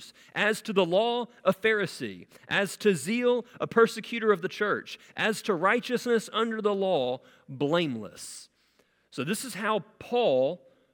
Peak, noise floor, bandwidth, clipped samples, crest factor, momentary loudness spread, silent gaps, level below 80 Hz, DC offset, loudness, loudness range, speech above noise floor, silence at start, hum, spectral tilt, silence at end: -8 dBFS; -68 dBFS; 18 kHz; under 0.1%; 20 dB; 14 LU; none; -74 dBFS; under 0.1%; -27 LUFS; 4 LU; 40 dB; 0 s; none; -4.5 dB/octave; 0.35 s